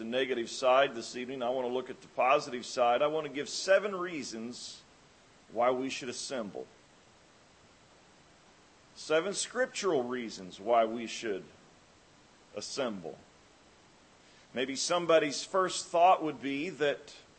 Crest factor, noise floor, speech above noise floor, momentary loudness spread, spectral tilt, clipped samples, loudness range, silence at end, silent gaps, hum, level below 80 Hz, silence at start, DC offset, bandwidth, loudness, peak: 20 dB; -61 dBFS; 30 dB; 16 LU; -3 dB/octave; under 0.1%; 10 LU; 0.15 s; none; none; -76 dBFS; 0 s; under 0.1%; 8.8 kHz; -31 LUFS; -12 dBFS